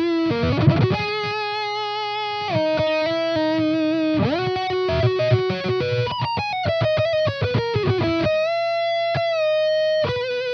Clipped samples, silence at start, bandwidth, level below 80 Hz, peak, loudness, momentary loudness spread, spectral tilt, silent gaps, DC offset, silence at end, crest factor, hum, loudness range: under 0.1%; 0 s; 6.6 kHz; -48 dBFS; -4 dBFS; -21 LUFS; 4 LU; -7 dB/octave; none; under 0.1%; 0 s; 18 dB; none; 1 LU